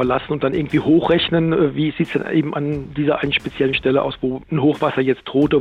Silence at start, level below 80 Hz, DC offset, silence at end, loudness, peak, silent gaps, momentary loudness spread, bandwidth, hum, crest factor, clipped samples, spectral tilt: 0 s; -44 dBFS; under 0.1%; 0 s; -19 LUFS; -4 dBFS; none; 6 LU; 7 kHz; none; 14 dB; under 0.1%; -8 dB/octave